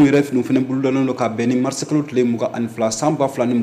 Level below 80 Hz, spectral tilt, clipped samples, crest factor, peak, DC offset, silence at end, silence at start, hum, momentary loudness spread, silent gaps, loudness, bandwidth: -62 dBFS; -6 dB/octave; under 0.1%; 12 dB; -6 dBFS; under 0.1%; 0 s; 0 s; none; 3 LU; none; -19 LUFS; 14.5 kHz